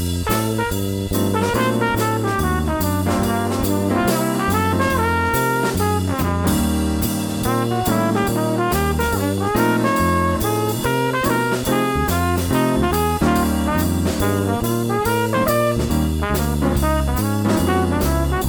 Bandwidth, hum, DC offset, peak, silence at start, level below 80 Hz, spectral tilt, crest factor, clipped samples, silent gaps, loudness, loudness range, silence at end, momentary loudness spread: over 20 kHz; none; under 0.1%; -4 dBFS; 0 s; -30 dBFS; -5.5 dB/octave; 14 dB; under 0.1%; none; -19 LUFS; 1 LU; 0 s; 3 LU